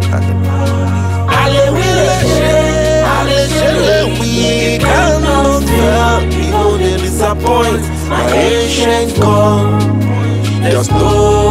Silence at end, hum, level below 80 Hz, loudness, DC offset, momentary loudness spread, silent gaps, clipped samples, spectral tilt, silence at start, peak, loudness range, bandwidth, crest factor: 0 s; none; -22 dBFS; -11 LUFS; under 0.1%; 4 LU; none; under 0.1%; -5.5 dB/octave; 0 s; 0 dBFS; 1 LU; 16 kHz; 10 dB